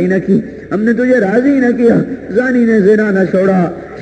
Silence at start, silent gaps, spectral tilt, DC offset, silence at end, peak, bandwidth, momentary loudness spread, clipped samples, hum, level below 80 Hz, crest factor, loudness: 0 s; none; -8.5 dB/octave; under 0.1%; 0 s; 0 dBFS; 8.8 kHz; 6 LU; under 0.1%; none; -46 dBFS; 12 dB; -12 LUFS